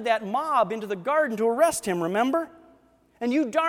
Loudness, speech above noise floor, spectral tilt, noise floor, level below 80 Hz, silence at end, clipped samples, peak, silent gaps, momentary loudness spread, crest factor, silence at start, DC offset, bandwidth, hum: -25 LUFS; 35 dB; -4.5 dB/octave; -59 dBFS; -66 dBFS; 0 s; under 0.1%; -8 dBFS; none; 7 LU; 18 dB; 0 s; under 0.1%; 17 kHz; none